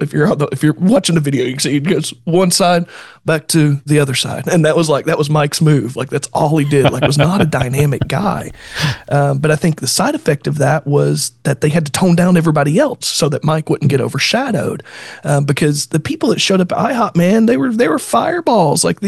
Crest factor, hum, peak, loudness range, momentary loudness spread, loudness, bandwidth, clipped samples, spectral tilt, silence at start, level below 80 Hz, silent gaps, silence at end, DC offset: 14 dB; none; 0 dBFS; 2 LU; 6 LU; -14 LUFS; 12.5 kHz; under 0.1%; -5 dB/octave; 0 s; -46 dBFS; none; 0 s; under 0.1%